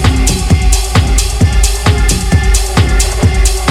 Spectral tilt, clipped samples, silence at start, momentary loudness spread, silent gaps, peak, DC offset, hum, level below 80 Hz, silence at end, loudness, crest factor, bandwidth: -4 dB/octave; under 0.1%; 0 s; 1 LU; none; 0 dBFS; under 0.1%; none; -12 dBFS; 0 s; -11 LUFS; 10 dB; 15.5 kHz